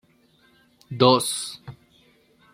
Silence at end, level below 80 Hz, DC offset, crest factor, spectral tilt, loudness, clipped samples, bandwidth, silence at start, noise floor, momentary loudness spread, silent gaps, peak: 0.85 s; -66 dBFS; under 0.1%; 24 dB; -4 dB/octave; -21 LUFS; under 0.1%; 16 kHz; 0.9 s; -60 dBFS; 23 LU; none; -2 dBFS